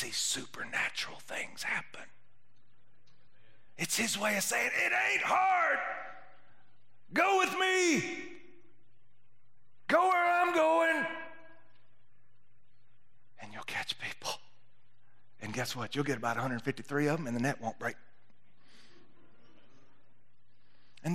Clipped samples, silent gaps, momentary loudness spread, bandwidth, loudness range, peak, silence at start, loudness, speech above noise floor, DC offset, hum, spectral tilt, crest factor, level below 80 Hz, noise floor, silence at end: under 0.1%; none; 16 LU; 16 kHz; 12 LU; -14 dBFS; 0 s; -31 LUFS; 43 dB; 0.5%; none; -3 dB/octave; 22 dB; -80 dBFS; -74 dBFS; 0 s